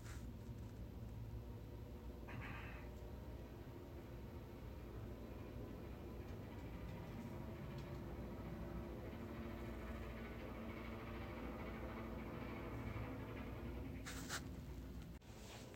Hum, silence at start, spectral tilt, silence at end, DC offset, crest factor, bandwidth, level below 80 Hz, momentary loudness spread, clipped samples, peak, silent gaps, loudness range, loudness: none; 0 s; -6 dB/octave; 0 s; under 0.1%; 18 dB; 16 kHz; -56 dBFS; 5 LU; under 0.1%; -34 dBFS; none; 4 LU; -52 LUFS